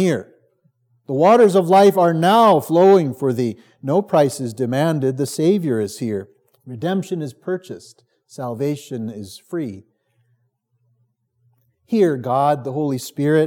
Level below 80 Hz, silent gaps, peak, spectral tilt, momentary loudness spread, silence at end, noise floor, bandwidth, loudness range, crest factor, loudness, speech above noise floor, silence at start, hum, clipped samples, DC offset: -78 dBFS; none; -2 dBFS; -6.5 dB/octave; 16 LU; 0 s; -67 dBFS; 18 kHz; 15 LU; 16 dB; -18 LUFS; 50 dB; 0 s; none; under 0.1%; under 0.1%